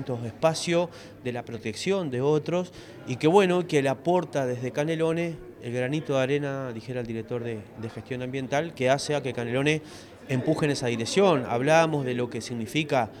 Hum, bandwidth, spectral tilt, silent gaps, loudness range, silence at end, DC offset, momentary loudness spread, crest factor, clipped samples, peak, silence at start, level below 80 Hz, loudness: none; 15.5 kHz; -5.5 dB/octave; none; 5 LU; 0 s; under 0.1%; 13 LU; 22 dB; under 0.1%; -6 dBFS; 0 s; -62 dBFS; -26 LUFS